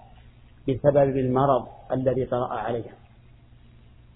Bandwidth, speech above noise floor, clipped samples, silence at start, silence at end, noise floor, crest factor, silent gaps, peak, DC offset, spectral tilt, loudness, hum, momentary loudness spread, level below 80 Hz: 3.9 kHz; 28 dB; under 0.1%; 0.65 s; 1.2 s; -52 dBFS; 20 dB; none; -6 dBFS; under 0.1%; -12 dB/octave; -24 LUFS; none; 11 LU; -50 dBFS